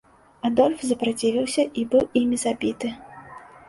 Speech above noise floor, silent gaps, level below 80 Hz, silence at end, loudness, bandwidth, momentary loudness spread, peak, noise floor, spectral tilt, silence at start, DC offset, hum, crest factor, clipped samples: 22 dB; none; -58 dBFS; 0.25 s; -23 LUFS; 11.5 kHz; 19 LU; -6 dBFS; -44 dBFS; -4 dB/octave; 0.45 s; under 0.1%; none; 18 dB; under 0.1%